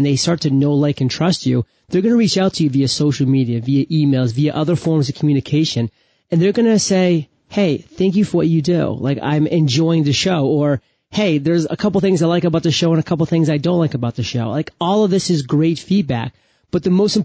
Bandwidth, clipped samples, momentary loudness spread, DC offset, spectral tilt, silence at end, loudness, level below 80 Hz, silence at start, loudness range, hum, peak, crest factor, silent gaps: 8 kHz; under 0.1%; 6 LU; under 0.1%; -6 dB/octave; 0 s; -17 LUFS; -48 dBFS; 0 s; 1 LU; none; -6 dBFS; 10 dB; none